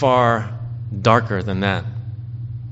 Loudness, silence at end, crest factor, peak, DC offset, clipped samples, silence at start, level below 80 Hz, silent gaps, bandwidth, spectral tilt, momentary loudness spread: -20 LUFS; 0 s; 20 dB; 0 dBFS; under 0.1%; under 0.1%; 0 s; -48 dBFS; none; 7.8 kHz; -5 dB/octave; 14 LU